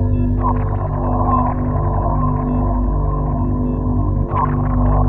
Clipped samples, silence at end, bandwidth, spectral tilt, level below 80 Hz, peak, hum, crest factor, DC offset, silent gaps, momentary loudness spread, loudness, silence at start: under 0.1%; 0 s; 2.8 kHz; -13 dB/octave; -20 dBFS; -2 dBFS; 50 Hz at -25 dBFS; 14 dB; under 0.1%; none; 3 LU; -18 LUFS; 0 s